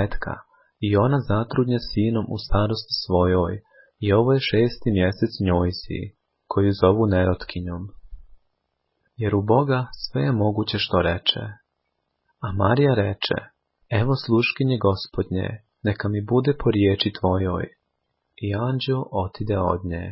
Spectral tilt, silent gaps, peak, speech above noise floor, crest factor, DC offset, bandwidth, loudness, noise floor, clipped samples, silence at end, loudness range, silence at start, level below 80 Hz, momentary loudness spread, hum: -10.5 dB/octave; none; -4 dBFS; 54 dB; 18 dB; under 0.1%; 5.8 kHz; -23 LUFS; -76 dBFS; under 0.1%; 0 s; 3 LU; 0 s; -38 dBFS; 12 LU; none